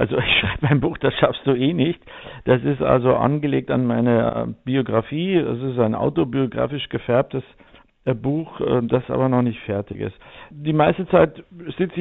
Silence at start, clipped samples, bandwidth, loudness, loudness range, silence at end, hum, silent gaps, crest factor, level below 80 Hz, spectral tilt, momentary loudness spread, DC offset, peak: 0 s; under 0.1%; 4.1 kHz; -20 LUFS; 3 LU; 0 s; none; none; 20 dB; -46 dBFS; -10.5 dB/octave; 11 LU; under 0.1%; 0 dBFS